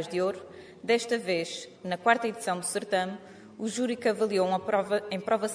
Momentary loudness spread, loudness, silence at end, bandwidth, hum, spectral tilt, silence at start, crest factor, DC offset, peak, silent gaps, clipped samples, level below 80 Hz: 12 LU; -29 LUFS; 0 s; 11 kHz; none; -4 dB/octave; 0 s; 22 dB; under 0.1%; -8 dBFS; none; under 0.1%; -74 dBFS